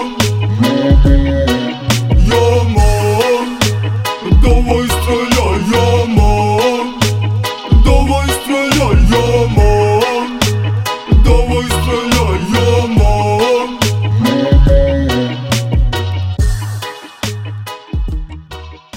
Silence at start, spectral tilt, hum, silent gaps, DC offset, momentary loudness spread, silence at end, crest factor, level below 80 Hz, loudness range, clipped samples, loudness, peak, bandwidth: 0 s; -5.5 dB/octave; none; none; under 0.1%; 10 LU; 0 s; 12 dB; -16 dBFS; 3 LU; under 0.1%; -13 LUFS; 0 dBFS; 16.5 kHz